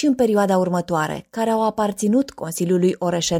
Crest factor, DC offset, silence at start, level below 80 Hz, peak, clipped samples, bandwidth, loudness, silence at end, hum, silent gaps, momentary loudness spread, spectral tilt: 12 dB; under 0.1%; 0 s; -54 dBFS; -6 dBFS; under 0.1%; 16.5 kHz; -20 LUFS; 0 s; none; none; 7 LU; -5.5 dB/octave